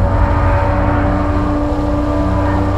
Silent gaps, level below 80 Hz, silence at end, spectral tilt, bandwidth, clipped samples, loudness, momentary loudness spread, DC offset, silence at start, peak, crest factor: none; -18 dBFS; 0 s; -9 dB/octave; 8.2 kHz; under 0.1%; -15 LUFS; 3 LU; under 0.1%; 0 s; -2 dBFS; 12 dB